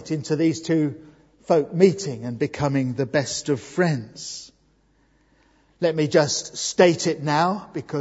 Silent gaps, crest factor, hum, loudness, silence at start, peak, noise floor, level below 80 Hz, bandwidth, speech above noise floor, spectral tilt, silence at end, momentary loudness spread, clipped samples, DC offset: none; 22 dB; none; -22 LUFS; 0 s; -2 dBFS; -62 dBFS; -60 dBFS; 8 kHz; 40 dB; -5 dB/octave; 0 s; 12 LU; under 0.1%; under 0.1%